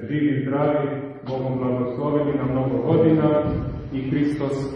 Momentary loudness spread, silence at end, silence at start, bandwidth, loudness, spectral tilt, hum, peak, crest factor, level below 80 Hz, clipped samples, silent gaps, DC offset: 10 LU; 0 s; 0 s; 9.6 kHz; -22 LUFS; -9.5 dB/octave; none; -6 dBFS; 16 dB; -44 dBFS; under 0.1%; none; under 0.1%